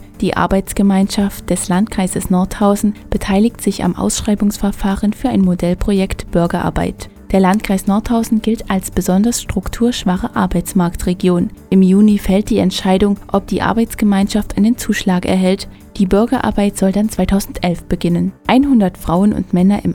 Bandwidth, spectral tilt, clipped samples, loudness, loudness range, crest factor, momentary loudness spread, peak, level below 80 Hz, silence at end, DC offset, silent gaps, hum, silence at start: 17 kHz; -6 dB/octave; under 0.1%; -15 LUFS; 2 LU; 14 dB; 5 LU; 0 dBFS; -30 dBFS; 0 s; under 0.1%; none; none; 0 s